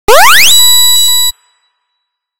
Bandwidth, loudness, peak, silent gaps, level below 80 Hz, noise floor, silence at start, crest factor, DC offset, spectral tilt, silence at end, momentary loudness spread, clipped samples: over 20 kHz; -3 LUFS; 0 dBFS; none; -36 dBFS; -69 dBFS; 0.05 s; 8 dB; under 0.1%; 1.5 dB/octave; 0 s; 7 LU; 3%